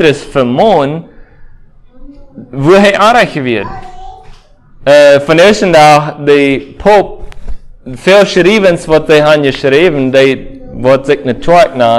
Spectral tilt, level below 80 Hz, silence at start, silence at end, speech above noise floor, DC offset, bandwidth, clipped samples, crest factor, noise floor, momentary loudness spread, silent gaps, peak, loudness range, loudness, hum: -5.5 dB/octave; -34 dBFS; 0 s; 0 s; 30 dB; under 0.1%; 14.5 kHz; 3%; 8 dB; -37 dBFS; 11 LU; none; 0 dBFS; 4 LU; -7 LUFS; none